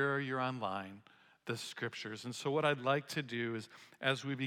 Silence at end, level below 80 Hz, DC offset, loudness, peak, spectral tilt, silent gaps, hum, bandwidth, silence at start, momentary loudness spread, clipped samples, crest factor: 0 s; -88 dBFS; under 0.1%; -38 LUFS; -18 dBFS; -5 dB/octave; none; none; 16.5 kHz; 0 s; 12 LU; under 0.1%; 20 dB